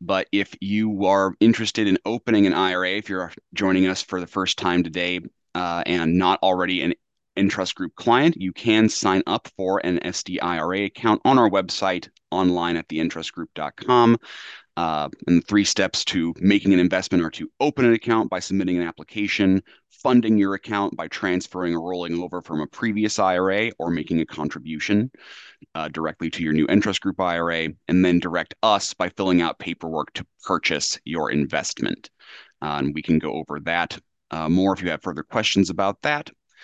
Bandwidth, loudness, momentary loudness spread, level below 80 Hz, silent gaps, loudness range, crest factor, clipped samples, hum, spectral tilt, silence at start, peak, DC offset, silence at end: 8.8 kHz; -22 LUFS; 11 LU; -50 dBFS; none; 4 LU; 18 dB; under 0.1%; none; -5 dB/octave; 0 s; -4 dBFS; under 0.1%; 0.35 s